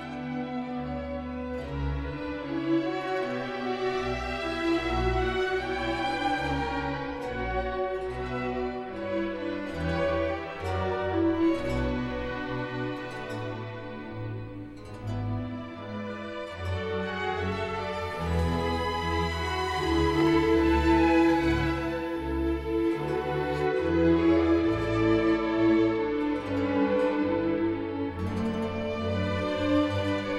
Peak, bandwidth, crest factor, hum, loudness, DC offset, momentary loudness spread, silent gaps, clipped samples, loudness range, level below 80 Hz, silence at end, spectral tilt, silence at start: -12 dBFS; 11.5 kHz; 16 dB; none; -28 LUFS; under 0.1%; 12 LU; none; under 0.1%; 9 LU; -40 dBFS; 0 s; -7 dB/octave; 0 s